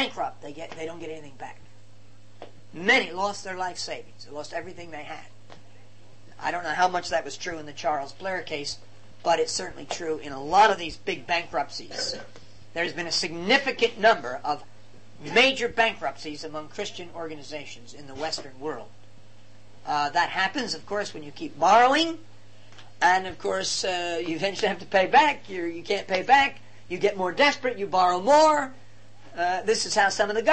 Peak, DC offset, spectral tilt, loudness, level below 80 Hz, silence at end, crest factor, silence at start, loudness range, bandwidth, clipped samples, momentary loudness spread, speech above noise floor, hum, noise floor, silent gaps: -6 dBFS; 0.9%; -2.5 dB/octave; -25 LUFS; -62 dBFS; 0 s; 20 dB; 0 s; 8 LU; 8.8 kHz; under 0.1%; 19 LU; 28 dB; none; -54 dBFS; none